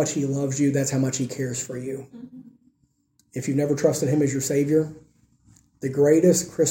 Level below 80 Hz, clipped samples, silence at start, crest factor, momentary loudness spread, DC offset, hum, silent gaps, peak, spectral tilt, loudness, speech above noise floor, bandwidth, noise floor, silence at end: -62 dBFS; under 0.1%; 0 s; 18 dB; 15 LU; under 0.1%; none; none; -6 dBFS; -5.5 dB/octave; -23 LUFS; 45 dB; 17 kHz; -67 dBFS; 0 s